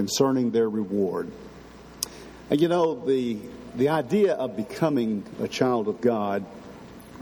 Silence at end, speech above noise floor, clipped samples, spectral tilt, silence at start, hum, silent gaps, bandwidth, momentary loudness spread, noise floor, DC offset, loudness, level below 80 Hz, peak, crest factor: 0 s; 21 dB; under 0.1%; -5.5 dB/octave; 0 s; none; none; 19.5 kHz; 21 LU; -45 dBFS; under 0.1%; -25 LUFS; -58 dBFS; -2 dBFS; 22 dB